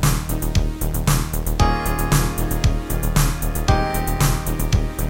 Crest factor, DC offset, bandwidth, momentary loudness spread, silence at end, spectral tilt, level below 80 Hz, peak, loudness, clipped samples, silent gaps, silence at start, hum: 16 dB; under 0.1%; 17 kHz; 3 LU; 0 s; -5 dB/octave; -22 dBFS; -2 dBFS; -21 LUFS; under 0.1%; none; 0 s; none